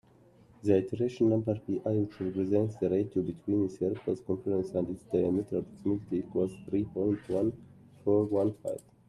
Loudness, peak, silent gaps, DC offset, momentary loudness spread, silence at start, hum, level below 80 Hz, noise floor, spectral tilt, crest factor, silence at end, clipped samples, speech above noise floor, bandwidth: -31 LUFS; -12 dBFS; none; under 0.1%; 6 LU; 0.65 s; none; -64 dBFS; -60 dBFS; -9.5 dB/octave; 18 dB; 0.3 s; under 0.1%; 30 dB; 11.5 kHz